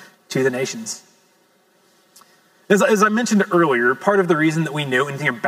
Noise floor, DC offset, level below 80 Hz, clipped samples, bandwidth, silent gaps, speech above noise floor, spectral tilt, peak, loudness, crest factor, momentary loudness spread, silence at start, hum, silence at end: -58 dBFS; under 0.1%; -80 dBFS; under 0.1%; 16 kHz; none; 41 dB; -5 dB/octave; 0 dBFS; -18 LUFS; 18 dB; 10 LU; 0 s; none; 0 s